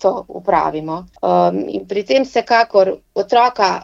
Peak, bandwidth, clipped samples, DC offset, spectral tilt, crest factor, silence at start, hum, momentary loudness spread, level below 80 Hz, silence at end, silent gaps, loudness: 0 dBFS; 7.6 kHz; under 0.1%; under 0.1%; -5.5 dB/octave; 14 dB; 0 s; none; 10 LU; -52 dBFS; 0 s; none; -16 LUFS